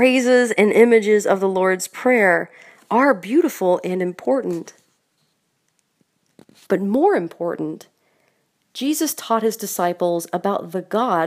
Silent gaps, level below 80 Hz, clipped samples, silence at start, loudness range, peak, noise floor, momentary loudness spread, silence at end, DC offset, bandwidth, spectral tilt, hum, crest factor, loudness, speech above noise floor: none; -74 dBFS; under 0.1%; 0 s; 8 LU; 0 dBFS; -69 dBFS; 12 LU; 0 s; under 0.1%; 15.5 kHz; -4.5 dB/octave; none; 18 dB; -19 LUFS; 51 dB